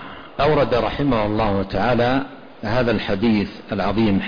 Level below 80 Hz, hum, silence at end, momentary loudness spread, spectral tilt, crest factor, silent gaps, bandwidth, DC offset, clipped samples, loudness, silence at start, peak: -36 dBFS; none; 0 s; 7 LU; -8 dB/octave; 12 dB; none; 5.2 kHz; 0.5%; under 0.1%; -20 LUFS; 0 s; -8 dBFS